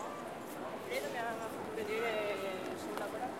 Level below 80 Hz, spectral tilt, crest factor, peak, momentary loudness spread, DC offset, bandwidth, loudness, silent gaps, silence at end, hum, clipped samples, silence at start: -72 dBFS; -4 dB/octave; 18 dB; -22 dBFS; 8 LU; under 0.1%; 16 kHz; -39 LUFS; none; 0 s; none; under 0.1%; 0 s